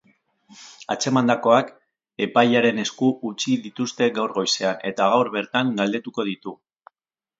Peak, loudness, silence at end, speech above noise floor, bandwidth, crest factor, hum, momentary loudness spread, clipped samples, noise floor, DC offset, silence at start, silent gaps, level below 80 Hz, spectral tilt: -2 dBFS; -21 LUFS; 0.85 s; 65 dB; 7.8 kHz; 20 dB; none; 11 LU; under 0.1%; -87 dBFS; under 0.1%; 0.6 s; none; -70 dBFS; -4.5 dB/octave